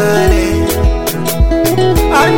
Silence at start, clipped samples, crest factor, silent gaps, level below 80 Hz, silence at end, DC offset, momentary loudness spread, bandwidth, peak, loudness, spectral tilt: 0 s; under 0.1%; 10 dB; none; -16 dBFS; 0 s; under 0.1%; 4 LU; 17.5 kHz; 0 dBFS; -12 LUFS; -5.5 dB/octave